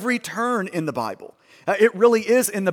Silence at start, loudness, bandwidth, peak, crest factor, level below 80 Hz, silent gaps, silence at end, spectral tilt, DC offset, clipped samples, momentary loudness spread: 0 s; -20 LUFS; 17.5 kHz; -4 dBFS; 18 dB; -72 dBFS; none; 0 s; -4.5 dB/octave; under 0.1%; under 0.1%; 14 LU